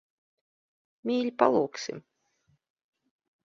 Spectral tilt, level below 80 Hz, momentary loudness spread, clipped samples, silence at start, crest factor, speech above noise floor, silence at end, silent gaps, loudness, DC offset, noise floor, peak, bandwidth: -5 dB/octave; -76 dBFS; 14 LU; under 0.1%; 1.05 s; 26 dB; 45 dB; 1.45 s; none; -28 LUFS; under 0.1%; -72 dBFS; -6 dBFS; 7.6 kHz